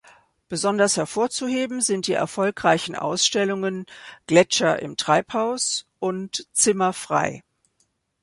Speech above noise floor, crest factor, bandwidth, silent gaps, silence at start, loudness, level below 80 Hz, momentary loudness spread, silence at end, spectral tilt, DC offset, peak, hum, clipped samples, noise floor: 47 dB; 20 dB; 11.5 kHz; none; 0.5 s; -22 LUFS; -64 dBFS; 10 LU; 0.8 s; -3 dB/octave; under 0.1%; -2 dBFS; none; under 0.1%; -69 dBFS